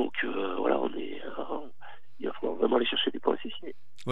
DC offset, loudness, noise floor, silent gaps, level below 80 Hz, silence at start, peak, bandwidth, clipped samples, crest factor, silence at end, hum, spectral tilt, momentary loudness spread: 2%; -31 LUFS; -53 dBFS; none; -82 dBFS; 0 s; -10 dBFS; 8.4 kHz; under 0.1%; 20 dB; 0 s; none; -6 dB/octave; 15 LU